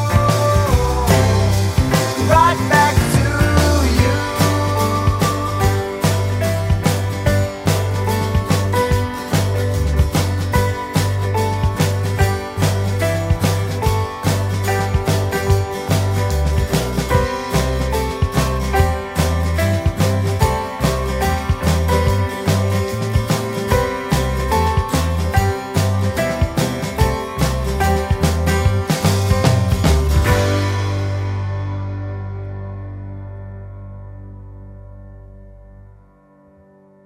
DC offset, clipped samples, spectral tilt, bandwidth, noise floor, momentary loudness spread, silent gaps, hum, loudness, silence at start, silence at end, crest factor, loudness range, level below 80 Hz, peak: under 0.1%; under 0.1%; -5.5 dB/octave; 16.5 kHz; -49 dBFS; 7 LU; none; 50 Hz at -40 dBFS; -18 LUFS; 0 s; 1.5 s; 16 dB; 6 LU; -26 dBFS; 0 dBFS